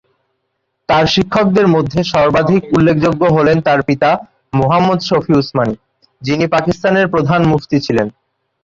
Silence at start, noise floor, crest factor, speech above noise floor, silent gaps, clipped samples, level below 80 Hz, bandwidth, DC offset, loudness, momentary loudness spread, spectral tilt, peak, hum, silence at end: 0.9 s; -69 dBFS; 12 dB; 57 dB; none; under 0.1%; -42 dBFS; 7.6 kHz; under 0.1%; -13 LUFS; 7 LU; -7 dB/octave; 0 dBFS; none; 0.55 s